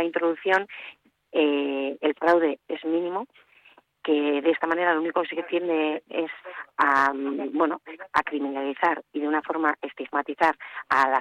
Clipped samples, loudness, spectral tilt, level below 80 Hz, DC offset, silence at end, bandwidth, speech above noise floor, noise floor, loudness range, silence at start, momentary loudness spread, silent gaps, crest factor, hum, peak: under 0.1%; -25 LUFS; -5 dB/octave; -70 dBFS; under 0.1%; 0 s; 9.6 kHz; 32 dB; -57 dBFS; 2 LU; 0 s; 12 LU; none; 18 dB; none; -8 dBFS